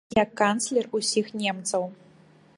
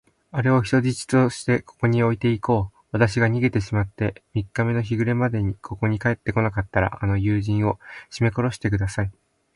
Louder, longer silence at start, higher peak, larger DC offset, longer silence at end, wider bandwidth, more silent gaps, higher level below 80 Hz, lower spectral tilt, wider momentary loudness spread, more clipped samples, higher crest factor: second, -26 LUFS vs -23 LUFS; second, 0.1 s vs 0.35 s; about the same, -6 dBFS vs -4 dBFS; neither; first, 0.65 s vs 0.45 s; about the same, 11.5 kHz vs 11.5 kHz; neither; second, -60 dBFS vs -42 dBFS; second, -3 dB/octave vs -7 dB/octave; about the same, 6 LU vs 8 LU; neither; about the same, 20 dB vs 18 dB